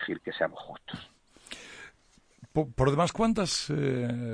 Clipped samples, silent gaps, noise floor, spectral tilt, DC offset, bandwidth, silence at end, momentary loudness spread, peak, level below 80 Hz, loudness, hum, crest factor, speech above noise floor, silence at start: under 0.1%; none; -63 dBFS; -5 dB/octave; under 0.1%; 10.5 kHz; 0 s; 19 LU; -12 dBFS; -50 dBFS; -29 LUFS; none; 20 dB; 34 dB; 0 s